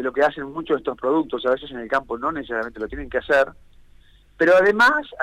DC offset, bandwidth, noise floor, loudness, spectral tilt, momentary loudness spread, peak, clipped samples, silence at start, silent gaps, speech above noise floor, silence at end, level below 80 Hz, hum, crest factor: under 0.1%; 13.5 kHz; -51 dBFS; -21 LUFS; -5 dB/octave; 12 LU; -8 dBFS; under 0.1%; 0 s; none; 30 dB; 0 s; -48 dBFS; none; 14 dB